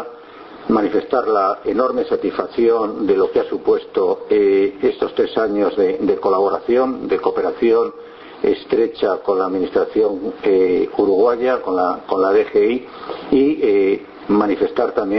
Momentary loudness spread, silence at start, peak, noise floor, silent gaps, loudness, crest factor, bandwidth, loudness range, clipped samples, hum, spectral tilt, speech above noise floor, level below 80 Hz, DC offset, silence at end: 5 LU; 0 s; -2 dBFS; -38 dBFS; none; -17 LUFS; 16 dB; 5.8 kHz; 2 LU; under 0.1%; none; -8.5 dB/octave; 21 dB; -52 dBFS; under 0.1%; 0 s